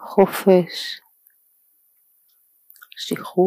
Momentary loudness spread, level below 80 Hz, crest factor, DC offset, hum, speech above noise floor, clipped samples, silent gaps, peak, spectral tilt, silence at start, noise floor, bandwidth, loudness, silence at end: 18 LU; -66 dBFS; 20 dB; under 0.1%; none; 43 dB; under 0.1%; none; -2 dBFS; -6 dB/octave; 0 s; -61 dBFS; 15.5 kHz; -20 LUFS; 0 s